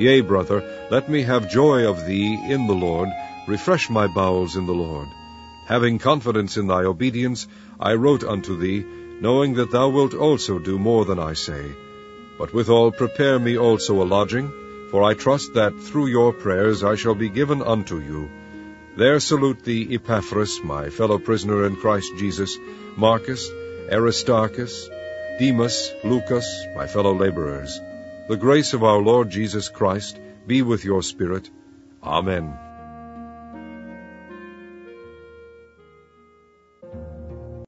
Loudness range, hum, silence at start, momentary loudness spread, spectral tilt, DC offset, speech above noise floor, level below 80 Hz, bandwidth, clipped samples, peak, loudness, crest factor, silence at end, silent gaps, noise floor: 5 LU; none; 0 s; 20 LU; -5.5 dB/octave; under 0.1%; 36 dB; -48 dBFS; 8 kHz; under 0.1%; -2 dBFS; -21 LUFS; 20 dB; 0 s; none; -56 dBFS